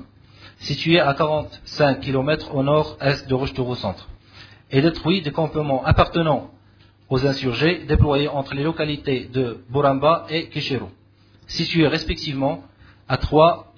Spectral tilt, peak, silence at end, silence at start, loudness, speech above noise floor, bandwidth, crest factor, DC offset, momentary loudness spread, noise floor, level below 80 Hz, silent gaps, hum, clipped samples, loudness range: -7 dB/octave; 0 dBFS; 0.15 s; 0 s; -21 LUFS; 32 dB; 5.4 kHz; 20 dB; under 0.1%; 9 LU; -52 dBFS; -36 dBFS; none; none; under 0.1%; 2 LU